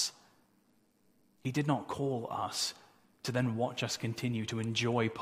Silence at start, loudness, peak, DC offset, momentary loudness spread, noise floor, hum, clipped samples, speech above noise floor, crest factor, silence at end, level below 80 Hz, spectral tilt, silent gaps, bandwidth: 0 s; -35 LUFS; -16 dBFS; under 0.1%; 5 LU; -70 dBFS; none; under 0.1%; 36 dB; 20 dB; 0 s; -70 dBFS; -4.5 dB/octave; none; 15.5 kHz